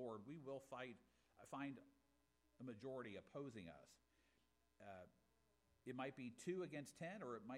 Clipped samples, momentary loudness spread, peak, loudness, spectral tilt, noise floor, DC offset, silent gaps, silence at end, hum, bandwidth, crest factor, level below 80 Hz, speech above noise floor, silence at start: under 0.1%; 13 LU; -38 dBFS; -55 LUFS; -6 dB/octave; -83 dBFS; under 0.1%; none; 0 s; none; 14 kHz; 18 dB; -86 dBFS; 29 dB; 0 s